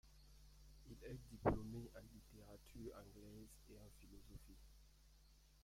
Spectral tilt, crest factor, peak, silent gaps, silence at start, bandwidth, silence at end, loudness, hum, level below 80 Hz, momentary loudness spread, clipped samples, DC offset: -7 dB/octave; 28 dB; -24 dBFS; none; 0.05 s; 16.5 kHz; 0 s; -51 LUFS; none; -62 dBFS; 24 LU; under 0.1%; under 0.1%